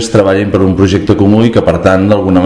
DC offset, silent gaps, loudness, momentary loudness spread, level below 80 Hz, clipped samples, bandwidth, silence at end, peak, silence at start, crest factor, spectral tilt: under 0.1%; none; -9 LUFS; 2 LU; -32 dBFS; 4%; 11 kHz; 0 s; 0 dBFS; 0 s; 8 dB; -7 dB/octave